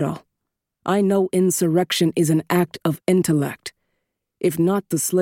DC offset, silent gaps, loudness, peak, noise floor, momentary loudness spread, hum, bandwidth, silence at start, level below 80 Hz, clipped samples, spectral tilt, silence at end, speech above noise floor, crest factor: under 0.1%; none; -20 LUFS; -4 dBFS; -81 dBFS; 9 LU; none; 17 kHz; 0 s; -62 dBFS; under 0.1%; -5.5 dB/octave; 0 s; 61 dB; 16 dB